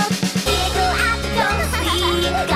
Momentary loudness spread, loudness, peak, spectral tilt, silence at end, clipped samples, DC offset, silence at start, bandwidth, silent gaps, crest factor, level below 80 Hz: 2 LU; -18 LUFS; -6 dBFS; -3.5 dB/octave; 0 s; under 0.1%; under 0.1%; 0 s; 16 kHz; none; 14 dB; -28 dBFS